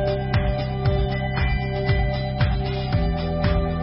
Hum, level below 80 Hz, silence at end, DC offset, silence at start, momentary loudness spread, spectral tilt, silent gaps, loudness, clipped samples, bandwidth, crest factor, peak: none; -28 dBFS; 0 s; under 0.1%; 0 s; 2 LU; -11.5 dB/octave; none; -23 LUFS; under 0.1%; 5.8 kHz; 14 dB; -8 dBFS